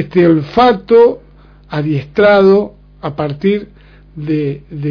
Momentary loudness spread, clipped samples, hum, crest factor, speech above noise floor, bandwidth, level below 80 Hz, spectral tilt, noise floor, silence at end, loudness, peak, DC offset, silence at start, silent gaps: 16 LU; under 0.1%; 50 Hz at -40 dBFS; 12 dB; 29 dB; 5.4 kHz; -42 dBFS; -9 dB/octave; -41 dBFS; 0 s; -12 LUFS; 0 dBFS; under 0.1%; 0 s; none